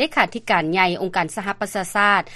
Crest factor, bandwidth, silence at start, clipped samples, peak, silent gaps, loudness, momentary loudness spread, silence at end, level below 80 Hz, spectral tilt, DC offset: 20 dB; 13 kHz; 0 s; under 0.1%; -2 dBFS; none; -20 LUFS; 8 LU; 0 s; -52 dBFS; -4 dB/octave; under 0.1%